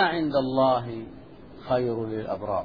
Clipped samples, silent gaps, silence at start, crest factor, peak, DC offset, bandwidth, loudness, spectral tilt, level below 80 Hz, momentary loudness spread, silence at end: under 0.1%; none; 0 s; 18 dB; -10 dBFS; 0.2%; 5.2 kHz; -26 LUFS; -9 dB/octave; -56 dBFS; 20 LU; 0 s